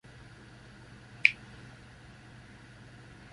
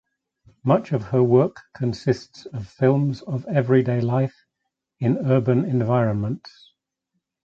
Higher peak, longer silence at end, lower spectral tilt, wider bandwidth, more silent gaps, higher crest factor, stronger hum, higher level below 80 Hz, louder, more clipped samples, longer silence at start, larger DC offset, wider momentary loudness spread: about the same, -2 dBFS vs -4 dBFS; second, 0 s vs 1.1 s; second, -3 dB/octave vs -9 dB/octave; first, 11.5 kHz vs 7.4 kHz; neither; first, 36 dB vs 18 dB; neither; second, -62 dBFS vs -56 dBFS; second, -26 LUFS vs -22 LUFS; neither; second, 0.05 s vs 0.65 s; neither; first, 26 LU vs 10 LU